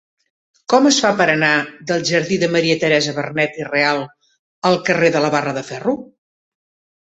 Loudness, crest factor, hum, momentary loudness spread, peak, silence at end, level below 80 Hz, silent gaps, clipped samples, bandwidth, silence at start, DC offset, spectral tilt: -17 LUFS; 16 dB; none; 9 LU; -2 dBFS; 0.95 s; -60 dBFS; 4.39-4.62 s; under 0.1%; 8.2 kHz; 0.7 s; under 0.1%; -4 dB/octave